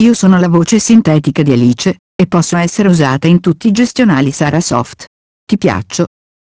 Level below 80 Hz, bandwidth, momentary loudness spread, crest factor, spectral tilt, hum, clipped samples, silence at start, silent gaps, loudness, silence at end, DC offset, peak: -42 dBFS; 8 kHz; 8 LU; 10 dB; -6 dB/octave; none; 0.5%; 0 s; 1.99-2.19 s, 5.07-5.47 s; -11 LUFS; 0.4 s; under 0.1%; 0 dBFS